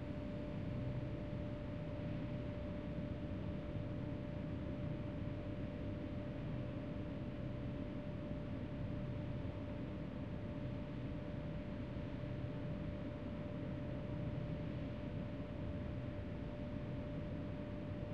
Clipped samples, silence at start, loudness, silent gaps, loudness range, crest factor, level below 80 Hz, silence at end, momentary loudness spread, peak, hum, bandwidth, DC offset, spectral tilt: under 0.1%; 0 s; -45 LUFS; none; 1 LU; 12 dB; -54 dBFS; 0 s; 2 LU; -30 dBFS; none; 7 kHz; 0.1%; -9.5 dB/octave